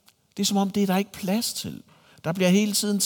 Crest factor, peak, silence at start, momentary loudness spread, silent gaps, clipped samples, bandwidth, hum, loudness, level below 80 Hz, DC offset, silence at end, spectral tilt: 16 dB; -8 dBFS; 0.35 s; 15 LU; none; under 0.1%; 19 kHz; none; -24 LUFS; -66 dBFS; under 0.1%; 0 s; -4.5 dB/octave